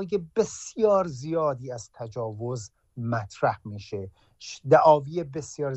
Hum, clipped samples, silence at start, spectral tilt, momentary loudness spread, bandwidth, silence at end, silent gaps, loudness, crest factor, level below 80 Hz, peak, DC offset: none; under 0.1%; 0 s; -6 dB/octave; 18 LU; 8.4 kHz; 0 s; none; -25 LUFS; 22 dB; -62 dBFS; -4 dBFS; under 0.1%